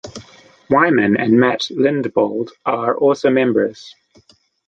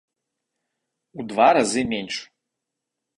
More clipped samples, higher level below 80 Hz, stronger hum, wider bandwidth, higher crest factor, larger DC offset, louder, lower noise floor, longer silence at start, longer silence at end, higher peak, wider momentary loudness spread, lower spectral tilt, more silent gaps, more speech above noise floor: neither; about the same, -58 dBFS vs -60 dBFS; neither; second, 7.8 kHz vs 11 kHz; about the same, 16 dB vs 20 dB; neither; first, -16 LUFS vs -21 LUFS; second, -54 dBFS vs -83 dBFS; second, 0.05 s vs 1.15 s; second, 0.75 s vs 0.95 s; about the same, -2 dBFS vs -4 dBFS; second, 9 LU vs 15 LU; first, -6 dB/octave vs -3.5 dB/octave; neither; second, 38 dB vs 63 dB